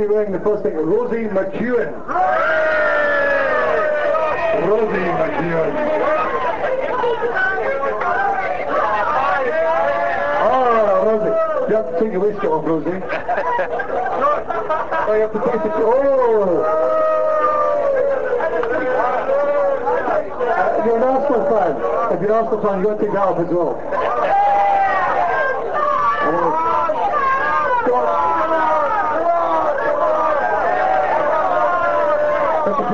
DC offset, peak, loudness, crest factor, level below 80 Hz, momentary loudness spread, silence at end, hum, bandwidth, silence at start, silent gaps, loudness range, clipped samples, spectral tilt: 4%; -6 dBFS; -17 LUFS; 12 dB; -48 dBFS; 4 LU; 0 s; none; 7.6 kHz; 0 s; none; 2 LU; under 0.1%; -6.5 dB/octave